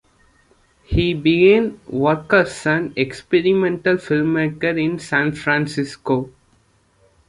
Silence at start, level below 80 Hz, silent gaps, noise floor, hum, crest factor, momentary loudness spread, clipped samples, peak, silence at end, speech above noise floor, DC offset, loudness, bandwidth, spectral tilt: 0.9 s; -40 dBFS; none; -58 dBFS; none; 18 dB; 9 LU; under 0.1%; -2 dBFS; 1 s; 40 dB; under 0.1%; -18 LUFS; 11.5 kHz; -6.5 dB/octave